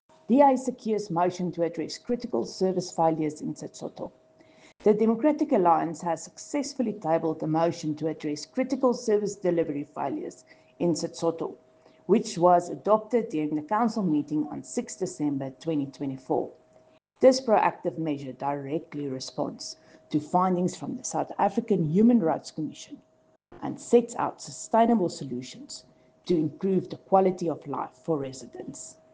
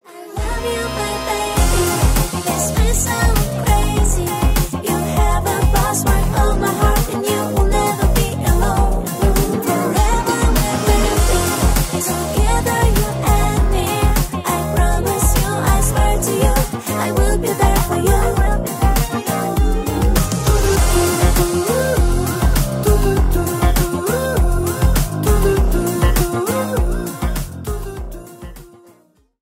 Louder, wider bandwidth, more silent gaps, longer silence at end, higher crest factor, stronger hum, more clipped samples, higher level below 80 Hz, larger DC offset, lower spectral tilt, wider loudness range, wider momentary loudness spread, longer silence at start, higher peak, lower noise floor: second, -27 LUFS vs -17 LUFS; second, 9.8 kHz vs 16.5 kHz; neither; second, 0.2 s vs 0.75 s; first, 22 dB vs 14 dB; neither; neither; second, -70 dBFS vs -18 dBFS; neither; about the same, -6 dB/octave vs -5 dB/octave; first, 4 LU vs 1 LU; first, 15 LU vs 5 LU; first, 0.3 s vs 0.1 s; second, -6 dBFS vs 0 dBFS; first, -60 dBFS vs -54 dBFS